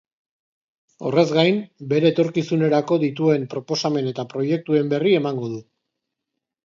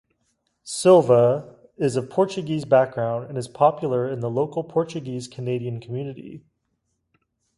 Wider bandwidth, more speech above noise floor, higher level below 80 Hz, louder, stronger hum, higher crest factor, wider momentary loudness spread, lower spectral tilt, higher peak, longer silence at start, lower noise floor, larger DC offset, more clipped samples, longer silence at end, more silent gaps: second, 7.6 kHz vs 11.5 kHz; first, 62 dB vs 53 dB; about the same, -68 dBFS vs -64 dBFS; about the same, -21 LUFS vs -22 LUFS; neither; about the same, 18 dB vs 20 dB; second, 8 LU vs 16 LU; about the same, -6.5 dB/octave vs -6.5 dB/octave; about the same, -4 dBFS vs -4 dBFS; first, 1 s vs 0.65 s; first, -82 dBFS vs -74 dBFS; neither; neither; second, 1.05 s vs 1.2 s; neither